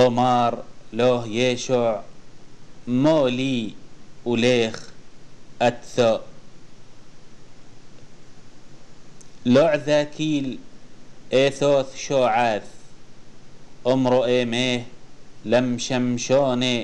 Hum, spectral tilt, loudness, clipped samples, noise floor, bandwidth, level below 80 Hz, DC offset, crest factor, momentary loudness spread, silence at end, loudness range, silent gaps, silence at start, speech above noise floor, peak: none; -5 dB/octave; -21 LUFS; under 0.1%; -43 dBFS; 10 kHz; -50 dBFS; 1%; 16 dB; 11 LU; 0 s; 6 LU; none; 0 s; 22 dB; -6 dBFS